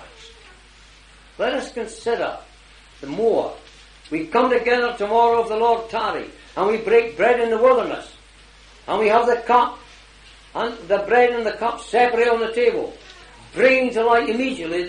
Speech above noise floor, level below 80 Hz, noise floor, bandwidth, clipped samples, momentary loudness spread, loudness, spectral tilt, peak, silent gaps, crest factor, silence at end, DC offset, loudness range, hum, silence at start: 29 dB; -52 dBFS; -48 dBFS; 10 kHz; under 0.1%; 14 LU; -19 LUFS; -4.5 dB/octave; -2 dBFS; none; 18 dB; 0 s; under 0.1%; 7 LU; none; 0 s